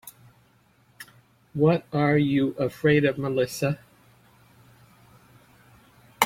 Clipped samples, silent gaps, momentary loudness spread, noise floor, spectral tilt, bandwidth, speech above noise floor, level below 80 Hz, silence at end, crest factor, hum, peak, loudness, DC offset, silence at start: under 0.1%; none; 25 LU; -61 dBFS; -6 dB/octave; 16 kHz; 38 dB; -60 dBFS; 0 s; 24 dB; none; -2 dBFS; -24 LUFS; under 0.1%; 0.05 s